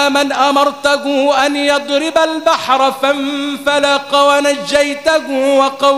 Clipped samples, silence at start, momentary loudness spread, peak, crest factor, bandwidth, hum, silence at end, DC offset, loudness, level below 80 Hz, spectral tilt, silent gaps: under 0.1%; 0 s; 4 LU; 0 dBFS; 12 dB; 16 kHz; none; 0 s; 0.2%; -13 LUFS; -54 dBFS; -2 dB/octave; none